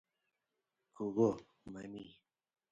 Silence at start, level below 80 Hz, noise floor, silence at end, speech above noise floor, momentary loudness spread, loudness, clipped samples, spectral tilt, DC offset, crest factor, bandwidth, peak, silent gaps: 1 s; -74 dBFS; -88 dBFS; 0.6 s; 51 dB; 19 LU; -37 LUFS; under 0.1%; -8 dB/octave; under 0.1%; 22 dB; 7.8 kHz; -20 dBFS; none